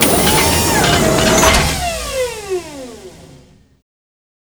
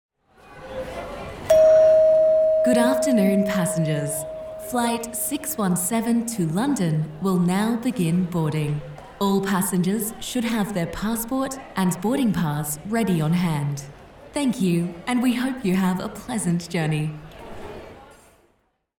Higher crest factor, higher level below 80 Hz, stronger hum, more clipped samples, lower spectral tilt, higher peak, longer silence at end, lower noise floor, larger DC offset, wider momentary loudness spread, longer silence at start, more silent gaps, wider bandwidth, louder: about the same, 16 dB vs 16 dB; first, -28 dBFS vs -50 dBFS; neither; neither; second, -3 dB/octave vs -6 dB/octave; first, 0 dBFS vs -6 dBFS; first, 1.2 s vs 0.95 s; second, -45 dBFS vs -67 dBFS; neither; about the same, 15 LU vs 15 LU; second, 0 s vs 0.5 s; neither; about the same, over 20 kHz vs 19.5 kHz; first, -13 LUFS vs -22 LUFS